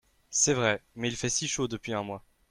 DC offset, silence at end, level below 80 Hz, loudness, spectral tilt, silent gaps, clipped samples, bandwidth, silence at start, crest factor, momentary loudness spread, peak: under 0.1%; 0.3 s; -58 dBFS; -29 LUFS; -3 dB/octave; none; under 0.1%; 14 kHz; 0.3 s; 20 dB; 10 LU; -10 dBFS